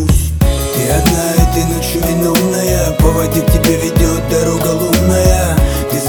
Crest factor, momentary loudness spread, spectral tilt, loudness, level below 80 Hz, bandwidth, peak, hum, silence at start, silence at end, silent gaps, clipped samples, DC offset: 12 dB; 3 LU; -5 dB/octave; -13 LUFS; -18 dBFS; over 20 kHz; 0 dBFS; none; 0 s; 0 s; none; under 0.1%; under 0.1%